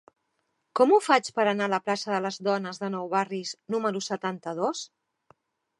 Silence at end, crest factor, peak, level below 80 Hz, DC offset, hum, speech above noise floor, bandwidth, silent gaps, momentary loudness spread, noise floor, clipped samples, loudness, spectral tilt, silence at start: 0.95 s; 22 dB; -6 dBFS; -82 dBFS; under 0.1%; none; 50 dB; 11.5 kHz; none; 11 LU; -77 dBFS; under 0.1%; -27 LUFS; -4.5 dB/octave; 0.75 s